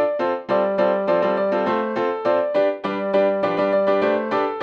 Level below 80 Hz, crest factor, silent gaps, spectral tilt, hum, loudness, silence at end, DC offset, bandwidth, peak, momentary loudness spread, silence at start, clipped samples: -70 dBFS; 12 dB; none; -7.5 dB/octave; none; -20 LUFS; 0 s; under 0.1%; 6.4 kHz; -8 dBFS; 3 LU; 0 s; under 0.1%